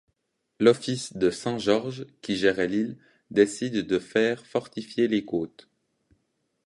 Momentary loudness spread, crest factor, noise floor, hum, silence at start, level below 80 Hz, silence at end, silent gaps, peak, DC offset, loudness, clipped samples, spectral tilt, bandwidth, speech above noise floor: 9 LU; 22 dB; -77 dBFS; none; 0.6 s; -62 dBFS; 1.2 s; none; -4 dBFS; under 0.1%; -26 LUFS; under 0.1%; -5 dB/octave; 11.5 kHz; 52 dB